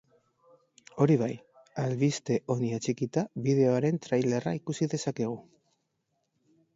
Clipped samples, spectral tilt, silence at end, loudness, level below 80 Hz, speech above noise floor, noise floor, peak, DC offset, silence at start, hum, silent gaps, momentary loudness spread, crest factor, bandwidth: under 0.1%; -6.5 dB/octave; 1.35 s; -29 LUFS; -70 dBFS; 50 dB; -78 dBFS; -10 dBFS; under 0.1%; 0.95 s; none; none; 10 LU; 20 dB; 8 kHz